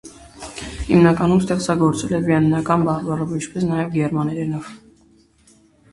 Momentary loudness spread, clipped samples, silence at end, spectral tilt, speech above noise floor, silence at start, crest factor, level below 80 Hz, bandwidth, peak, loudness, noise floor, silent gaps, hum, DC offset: 16 LU; under 0.1%; 1.15 s; -7 dB/octave; 36 dB; 0.05 s; 20 dB; -42 dBFS; 11.5 kHz; 0 dBFS; -19 LUFS; -54 dBFS; none; none; under 0.1%